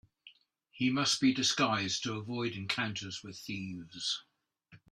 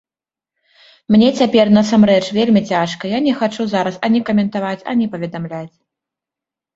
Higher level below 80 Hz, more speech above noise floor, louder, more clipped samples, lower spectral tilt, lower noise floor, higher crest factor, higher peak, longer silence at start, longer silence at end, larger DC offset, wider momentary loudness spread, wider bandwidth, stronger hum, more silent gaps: second, -72 dBFS vs -56 dBFS; second, 30 dB vs 75 dB; second, -33 LUFS vs -15 LUFS; neither; second, -3 dB/octave vs -6.5 dB/octave; second, -63 dBFS vs -90 dBFS; about the same, 20 dB vs 16 dB; second, -14 dBFS vs 0 dBFS; second, 0.25 s vs 1.1 s; second, 0.15 s vs 1.1 s; neither; about the same, 13 LU vs 11 LU; first, 13 kHz vs 7.8 kHz; neither; neither